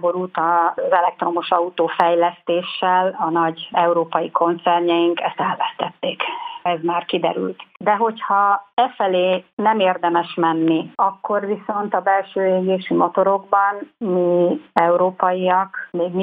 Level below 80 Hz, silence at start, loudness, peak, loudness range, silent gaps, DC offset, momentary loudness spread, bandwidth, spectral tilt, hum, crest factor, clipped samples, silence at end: -70 dBFS; 0 s; -19 LUFS; 0 dBFS; 2 LU; 8.73-8.77 s, 9.53-9.57 s; under 0.1%; 6 LU; 4.9 kHz; -8.5 dB/octave; none; 18 dB; under 0.1%; 0 s